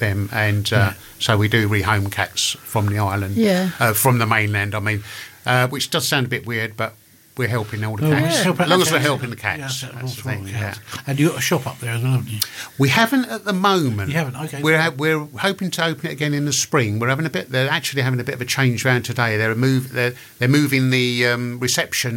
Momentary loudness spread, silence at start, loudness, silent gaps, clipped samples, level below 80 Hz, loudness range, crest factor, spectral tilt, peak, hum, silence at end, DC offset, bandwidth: 9 LU; 0 s; -19 LUFS; none; under 0.1%; -60 dBFS; 3 LU; 16 dB; -4.5 dB/octave; -2 dBFS; none; 0 s; under 0.1%; 17 kHz